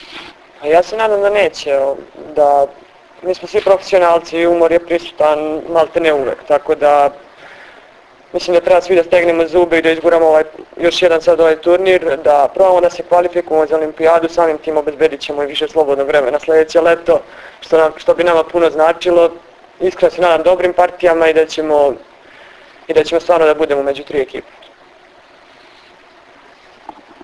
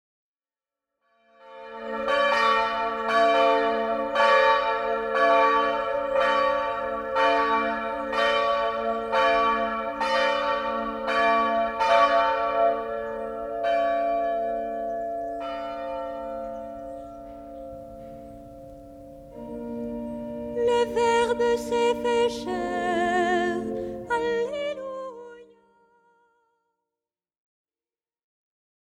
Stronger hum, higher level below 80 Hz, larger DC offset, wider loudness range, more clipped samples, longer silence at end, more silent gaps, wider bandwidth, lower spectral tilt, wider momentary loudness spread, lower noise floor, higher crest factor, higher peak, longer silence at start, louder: neither; first, -48 dBFS vs -56 dBFS; neither; second, 4 LU vs 15 LU; neither; second, 2.85 s vs 3.55 s; neither; second, 11 kHz vs 13 kHz; about the same, -4.5 dB/octave vs -3.5 dB/octave; second, 8 LU vs 19 LU; second, -44 dBFS vs under -90 dBFS; about the same, 14 dB vs 18 dB; first, 0 dBFS vs -8 dBFS; second, 0.1 s vs 1.45 s; first, -13 LUFS vs -24 LUFS